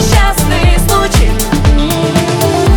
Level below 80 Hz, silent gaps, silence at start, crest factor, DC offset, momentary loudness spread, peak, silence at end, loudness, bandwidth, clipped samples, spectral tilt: -12 dBFS; none; 0 s; 8 dB; under 0.1%; 2 LU; 0 dBFS; 0 s; -11 LUFS; over 20 kHz; under 0.1%; -5 dB/octave